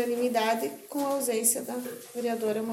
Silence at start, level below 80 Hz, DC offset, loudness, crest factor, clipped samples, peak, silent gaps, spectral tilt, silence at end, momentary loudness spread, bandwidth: 0 s; -78 dBFS; under 0.1%; -29 LUFS; 20 dB; under 0.1%; -10 dBFS; none; -2.5 dB/octave; 0 s; 10 LU; 17 kHz